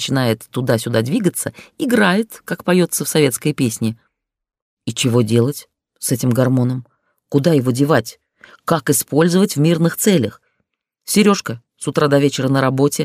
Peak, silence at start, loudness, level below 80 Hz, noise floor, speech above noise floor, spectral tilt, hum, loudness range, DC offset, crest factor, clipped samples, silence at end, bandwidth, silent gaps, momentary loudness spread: -2 dBFS; 0 s; -17 LUFS; -60 dBFS; -72 dBFS; 56 dB; -5 dB/octave; none; 3 LU; under 0.1%; 16 dB; under 0.1%; 0 s; 16 kHz; 4.62-4.77 s; 11 LU